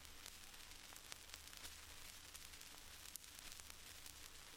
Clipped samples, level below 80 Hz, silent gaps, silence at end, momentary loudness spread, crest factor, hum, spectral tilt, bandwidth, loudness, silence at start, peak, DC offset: under 0.1%; -66 dBFS; none; 0 s; 2 LU; 34 dB; none; -0.5 dB/octave; 16.5 kHz; -55 LUFS; 0 s; -24 dBFS; under 0.1%